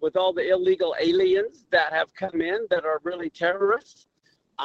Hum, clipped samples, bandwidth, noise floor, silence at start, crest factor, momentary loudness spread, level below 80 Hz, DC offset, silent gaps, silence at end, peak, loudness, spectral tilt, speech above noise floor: none; under 0.1%; 7.2 kHz; -45 dBFS; 0 s; 16 dB; 6 LU; -64 dBFS; under 0.1%; none; 0 s; -8 dBFS; -24 LUFS; -5.5 dB/octave; 21 dB